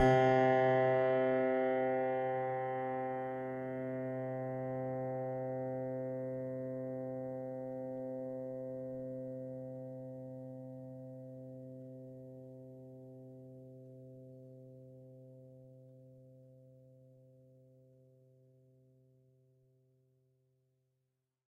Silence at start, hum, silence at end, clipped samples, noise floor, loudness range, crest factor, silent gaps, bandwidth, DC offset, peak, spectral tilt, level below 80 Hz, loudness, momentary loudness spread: 0 s; none; 4.65 s; under 0.1%; -86 dBFS; 23 LU; 20 dB; none; 7.2 kHz; under 0.1%; -18 dBFS; -8 dB/octave; -68 dBFS; -37 LUFS; 24 LU